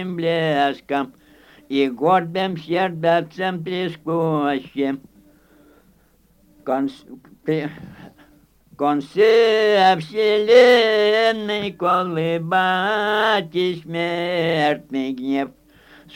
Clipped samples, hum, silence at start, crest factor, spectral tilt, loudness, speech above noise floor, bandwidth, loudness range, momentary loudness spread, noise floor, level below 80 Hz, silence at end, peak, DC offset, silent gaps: under 0.1%; none; 0 s; 18 dB; -6 dB/octave; -19 LUFS; 38 dB; 16.5 kHz; 12 LU; 11 LU; -57 dBFS; -62 dBFS; 0.65 s; -2 dBFS; under 0.1%; none